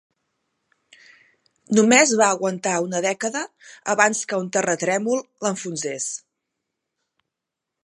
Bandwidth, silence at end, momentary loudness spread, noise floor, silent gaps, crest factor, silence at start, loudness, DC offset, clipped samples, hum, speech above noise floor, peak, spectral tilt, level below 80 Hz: 11.5 kHz; 1.65 s; 13 LU; -84 dBFS; none; 22 dB; 1.7 s; -21 LUFS; under 0.1%; under 0.1%; none; 63 dB; 0 dBFS; -3 dB/octave; -72 dBFS